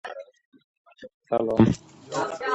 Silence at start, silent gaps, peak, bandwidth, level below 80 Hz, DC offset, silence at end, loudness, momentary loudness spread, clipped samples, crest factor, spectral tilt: 0.05 s; 0.45-0.52 s, 0.64-0.85 s, 1.14-1.21 s; -4 dBFS; 8.2 kHz; -50 dBFS; under 0.1%; 0 s; -25 LUFS; 17 LU; under 0.1%; 24 dB; -7 dB/octave